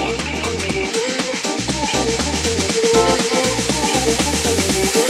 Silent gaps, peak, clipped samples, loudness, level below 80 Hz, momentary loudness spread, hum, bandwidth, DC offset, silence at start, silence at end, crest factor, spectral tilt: none; -2 dBFS; under 0.1%; -17 LUFS; -34 dBFS; 6 LU; none; 16 kHz; under 0.1%; 0 s; 0 s; 16 dB; -3 dB/octave